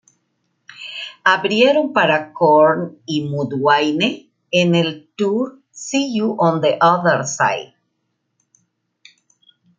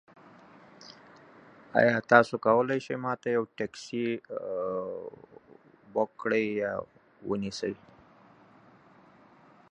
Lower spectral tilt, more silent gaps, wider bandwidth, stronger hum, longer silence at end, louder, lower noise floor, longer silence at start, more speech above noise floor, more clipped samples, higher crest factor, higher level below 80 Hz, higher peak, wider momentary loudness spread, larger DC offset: second, -4.5 dB/octave vs -6 dB/octave; neither; about the same, 9.2 kHz vs 10 kHz; neither; first, 2.15 s vs 1.95 s; first, -17 LUFS vs -29 LUFS; first, -72 dBFS vs -58 dBFS; about the same, 0.8 s vs 0.8 s; first, 55 dB vs 29 dB; neither; second, 18 dB vs 28 dB; about the same, -66 dBFS vs -70 dBFS; first, 0 dBFS vs -4 dBFS; second, 13 LU vs 22 LU; neither